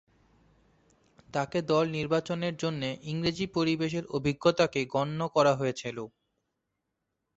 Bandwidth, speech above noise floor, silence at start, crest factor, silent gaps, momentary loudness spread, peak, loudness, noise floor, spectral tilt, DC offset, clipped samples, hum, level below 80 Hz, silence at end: 8.2 kHz; 54 dB; 1.35 s; 20 dB; none; 9 LU; -10 dBFS; -29 LUFS; -83 dBFS; -6 dB/octave; under 0.1%; under 0.1%; none; -62 dBFS; 1.3 s